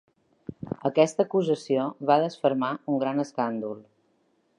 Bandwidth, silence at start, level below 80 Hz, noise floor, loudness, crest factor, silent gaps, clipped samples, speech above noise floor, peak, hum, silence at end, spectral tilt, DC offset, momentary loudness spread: 11 kHz; 0.5 s; -68 dBFS; -68 dBFS; -26 LUFS; 20 dB; none; under 0.1%; 43 dB; -6 dBFS; none; 0.75 s; -6 dB/octave; under 0.1%; 16 LU